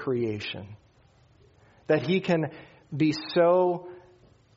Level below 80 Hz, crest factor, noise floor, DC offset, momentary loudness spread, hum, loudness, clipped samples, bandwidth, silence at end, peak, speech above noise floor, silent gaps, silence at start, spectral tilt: -66 dBFS; 18 dB; -60 dBFS; under 0.1%; 19 LU; none; -26 LUFS; under 0.1%; 7.6 kHz; 0.6 s; -10 dBFS; 34 dB; none; 0 s; -5.5 dB/octave